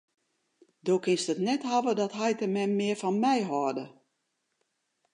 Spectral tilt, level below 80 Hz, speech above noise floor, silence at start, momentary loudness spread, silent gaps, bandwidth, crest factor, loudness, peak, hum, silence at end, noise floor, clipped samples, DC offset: -5 dB/octave; -82 dBFS; 51 dB; 0.85 s; 6 LU; none; 11 kHz; 16 dB; -29 LUFS; -14 dBFS; none; 1.25 s; -79 dBFS; under 0.1%; under 0.1%